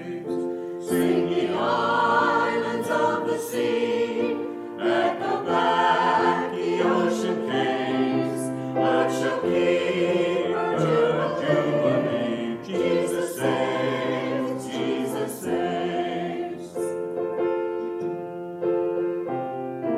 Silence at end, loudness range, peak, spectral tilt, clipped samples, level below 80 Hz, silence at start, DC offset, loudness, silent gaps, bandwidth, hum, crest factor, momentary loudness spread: 0 s; 5 LU; -8 dBFS; -5.5 dB/octave; under 0.1%; -68 dBFS; 0 s; under 0.1%; -24 LUFS; none; 15 kHz; none; 16 dB; 8 LU